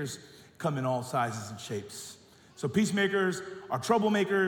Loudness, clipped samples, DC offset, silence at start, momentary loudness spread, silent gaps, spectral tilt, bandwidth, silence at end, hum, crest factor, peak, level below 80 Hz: -30 LUFS; under 0.1%; under 0.1%; 0 s; 13 LU; none; -5 dB/octave; 18 kHz; 0 s; none; 18 dB; -12 dBFS; -70 dBFS